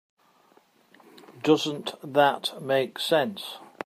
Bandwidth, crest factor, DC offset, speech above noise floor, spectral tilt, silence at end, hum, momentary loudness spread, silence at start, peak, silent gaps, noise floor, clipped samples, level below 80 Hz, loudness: 15.5 kHz; 20 dB; under 0.1%; 36 dB; -4.5 dB/octave; 0.2 s; none; 11 LU; 1.3 s; -8 dBFS; none; -61 dBFS; under 0.1%; -80 dBFS; -25 LUFS